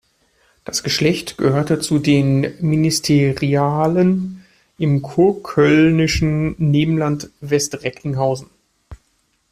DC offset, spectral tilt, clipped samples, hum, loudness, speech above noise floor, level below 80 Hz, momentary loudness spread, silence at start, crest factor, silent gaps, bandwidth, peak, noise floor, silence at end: under 0.1%; -5.5 dB/octave; under 0.1%; none; -17 LUFS; 47 dB; -42 dBFS; 9 LU; 0.7 s; 14 dB; none; 15 kHz; -2 dBFS; -64 dBFS; 0.55 s